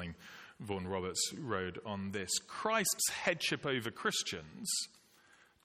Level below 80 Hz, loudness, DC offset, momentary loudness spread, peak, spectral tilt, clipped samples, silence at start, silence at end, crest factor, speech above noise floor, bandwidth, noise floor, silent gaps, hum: -70 dBFS; -36 LUFS; under 0.1%; 11 LU; -16 dBFS; -2.5 dB/octave; under 0.1%; 0 s; 0.75 s; 22 dB; 28 dB; 16.5 kHz; -66 dBFS; none; none